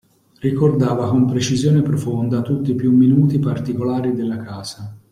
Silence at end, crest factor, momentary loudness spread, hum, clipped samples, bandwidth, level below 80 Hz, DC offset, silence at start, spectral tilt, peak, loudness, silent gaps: 0.15 s; 14 dB; 12 LU; none; under 0.1%; 12 kHz; -52 dBFS; under 0.1%; 0.45 s; -7.5 dB/octave; -2 dBFS; -18 LUFS; none